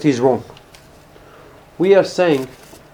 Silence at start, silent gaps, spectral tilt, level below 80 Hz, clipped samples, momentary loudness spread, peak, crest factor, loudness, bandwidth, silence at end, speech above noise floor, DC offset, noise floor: 0 s; none; -6 dB/octave; -54 dBFS; under 0.1%; 9 LU; 0 dBFS; 18 dB; -16 LUFS; 17 kHz; 0.45 s; 29 dB; under 0.1%; -44 dBFS